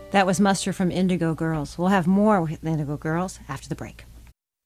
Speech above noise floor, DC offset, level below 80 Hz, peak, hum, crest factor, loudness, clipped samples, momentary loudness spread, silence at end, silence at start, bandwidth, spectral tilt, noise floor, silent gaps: 27 dB; under 0.1%; -48 dBFS; -6 dBFS; none; 18 dB; -23 LUFS; under 0.1%; 15 LU; 0.45 s; 0 s; 14 kHz; -6 dB/octave; -50 dBFS; none